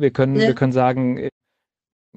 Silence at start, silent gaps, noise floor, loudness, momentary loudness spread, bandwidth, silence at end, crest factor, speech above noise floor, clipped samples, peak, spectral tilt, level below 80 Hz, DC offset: 0 s; none; -80 dBFS; -18 LUFS; 9 LU; 8 kHz; 0.9 s; 16 dB; 62 dB; under 0.1%; -4 dBFS; -8 dB/octave; -58 dBFS; under 0.1%